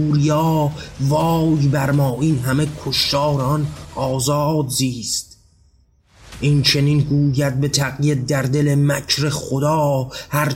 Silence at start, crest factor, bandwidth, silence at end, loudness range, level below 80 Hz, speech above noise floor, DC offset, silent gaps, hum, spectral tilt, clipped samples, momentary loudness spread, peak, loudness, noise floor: 0 s; 14 dB; 16.5 kHz; 0 s; 3 LU; -44 dBFS; 38 dB; under 0.1%; none; none; -5.5 dB/octave; under 0.1%; 7 LU; -4 dBFS; -18 LUFS; -55 dBFS